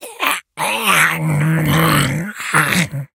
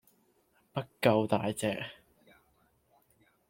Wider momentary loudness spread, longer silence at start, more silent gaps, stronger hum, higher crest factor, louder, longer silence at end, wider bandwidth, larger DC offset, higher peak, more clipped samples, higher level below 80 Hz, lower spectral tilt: second, 7 LU vs 13 LU; second, 0 s vs 0.75 s; neither; neither; second, 16 dB vs 24 dB; first, -15 LUFS vs -32 LUFS; second, 0.1 s vs 1.55 s; first, 18.5 kHz vs 16.5 kHz; neither; first, 0 dBFS vs -10 dBFS; neither; first, -46 dBFS vs -70 dBFS; second, -4 dB/octave vs -5.5 dB/octave